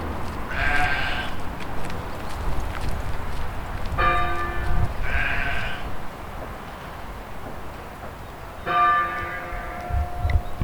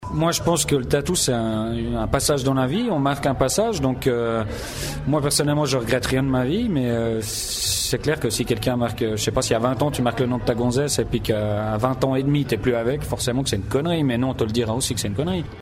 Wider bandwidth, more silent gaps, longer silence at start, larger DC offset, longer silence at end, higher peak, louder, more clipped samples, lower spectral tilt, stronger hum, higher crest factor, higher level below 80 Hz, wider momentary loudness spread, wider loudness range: first, 19.5 kHz vs 16 kHz; neither; about the same, 0 s vs 0 s; neither; about the same, 0 s vs 0 s; about the same, -8 dBFS vs -6 dBFS; second, -27 LUFS vs -22 LUFS; neither; about the same, -5.5 dB/octave vs -4.5 dB/octave; neither; about the same, 16 dB vs 16 dB; first, -30 dBFS vs -38 dBFS; first, 15 LU vs 4 LU; first, 4 LU vs 1 LU